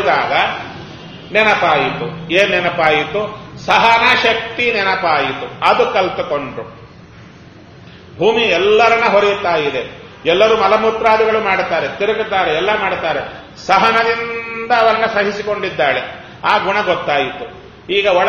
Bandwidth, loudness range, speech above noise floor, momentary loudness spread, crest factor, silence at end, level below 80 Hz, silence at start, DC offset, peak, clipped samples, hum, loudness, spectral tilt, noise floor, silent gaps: 9 kHz; 4 LU; 25 dB; 13 LU; 16 dB; 0 s; -48 dBFS; 0 s; under 0.1%; 0 dBFS; under 0.1%; none; -14 LUFS; -4.5 dB/octave; -39 dBFS; none